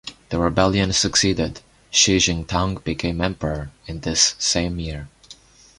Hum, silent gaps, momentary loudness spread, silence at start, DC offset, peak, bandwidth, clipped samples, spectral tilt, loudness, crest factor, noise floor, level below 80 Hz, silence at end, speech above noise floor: none; none; 14 LU; 0.05 s; under 0.1%; 0 dBFS; 11.5 kHz; under 0.1%; -3 dB/octave; -20 LUFS; 22 dB; -47 dBFS; -36 dBFS; 0.45 s; 26 dB